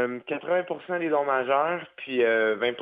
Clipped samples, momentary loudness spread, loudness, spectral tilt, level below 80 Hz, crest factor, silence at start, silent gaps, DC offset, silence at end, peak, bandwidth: under 0.1%; 8 LU; -26 LUFS; -7.5 dB/octave; -76 dBFS; 16 dB; 0 s; none; under 0.1%; 0 s; -10 dBFS; 4.9 kHz